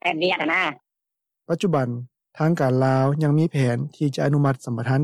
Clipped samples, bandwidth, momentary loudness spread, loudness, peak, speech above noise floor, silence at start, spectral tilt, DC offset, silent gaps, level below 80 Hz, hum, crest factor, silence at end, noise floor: under 0.1%; 12 kHz; 7 LU; -22 LUFS; -8 dBFS; 63 dB; 0.05 s; -7 dB/octave; under 0.1%; none; -66 dBFS; none; 12 dB; 0 s; -84 dBFS